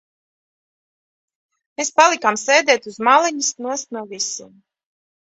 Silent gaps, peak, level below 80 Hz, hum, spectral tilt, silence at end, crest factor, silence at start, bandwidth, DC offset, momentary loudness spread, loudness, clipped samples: none; 0 dBFS; -72 dBFS; none; -0.5 dB/octave; 0.75 s; 20 dB; 1.8 s; 8.4 kHz; under 0.1%; 12 LU; -17 LUFS; under 0.1%